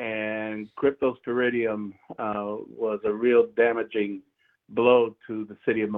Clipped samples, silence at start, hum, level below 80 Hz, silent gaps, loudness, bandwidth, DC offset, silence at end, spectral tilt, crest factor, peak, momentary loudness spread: under 0.1%; 0 s; none; -68 dBFS; none; -26 LUFS; 3.9 kHz; under 0.1%; 0 s; -9 dB/octave; 20 dB; -6 dBFS; 14 LU